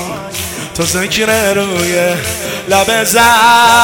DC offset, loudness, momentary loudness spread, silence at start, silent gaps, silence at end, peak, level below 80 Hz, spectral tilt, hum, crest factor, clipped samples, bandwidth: under 0.1%; -11 LUFS; 14 LU; 0 s; none; 0 s; 0 dBFS; -42 dBFS; -2.5 dB/octave; none; 12 dB; 1%; over 20 kHz